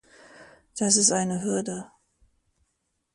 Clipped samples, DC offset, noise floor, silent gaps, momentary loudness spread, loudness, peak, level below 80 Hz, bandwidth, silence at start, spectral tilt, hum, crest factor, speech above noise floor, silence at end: under 0.1%; under 0.1%; -77 dBFS; none; 18 LU; -23 LUFS; -6 dBFS; -66 dBFS; 11.5 kHz; 0.4 s; -3 dB/octave; none; 24 dB; 52 dB; 1.3 s